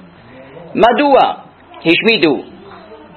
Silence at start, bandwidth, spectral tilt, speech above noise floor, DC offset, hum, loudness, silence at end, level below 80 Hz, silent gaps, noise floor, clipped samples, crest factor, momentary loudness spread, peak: 0.4 s; 7.6 kHz; -6.5 dB/octave; 27 dB; under 0.1%; none; -12 LUFS; 0.2 s; -52 dBFS; none; -38 dBFS; under 0.1%; 14 dB; 15 LU; 0 dBFS